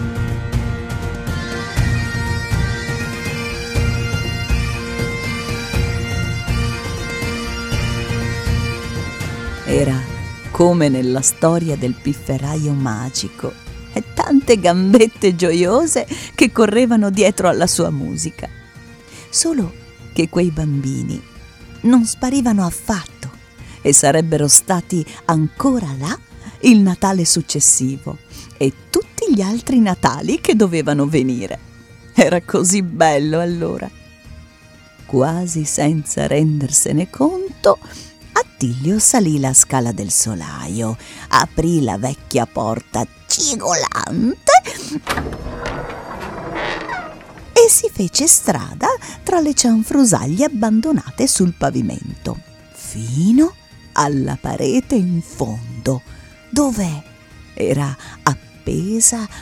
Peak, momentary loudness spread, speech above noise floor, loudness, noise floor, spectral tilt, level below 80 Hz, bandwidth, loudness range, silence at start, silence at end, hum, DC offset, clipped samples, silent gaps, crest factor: 0 dBFS; 14 LU; 28 dB; -16 LUFS; -44 dBFS; -4.5 dB/octave; -34 dBFS; 19 kHz; 7 LU; 0 s; 0 s; none; under 0.1%; under 0.1%; none; 18 dB